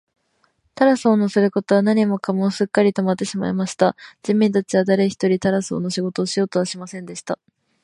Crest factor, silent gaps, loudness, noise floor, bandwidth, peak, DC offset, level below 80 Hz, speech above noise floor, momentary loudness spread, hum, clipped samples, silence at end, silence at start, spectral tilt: 18 dB; none; -19 LUFS; -65 dBFS; 11.5 kHz; 0 dBFS; under 0.1%; -62 dBFS; 46 dB; 12 LU; none; under 0.1%; 0.5 s; 0.75 s; -6 dB/octave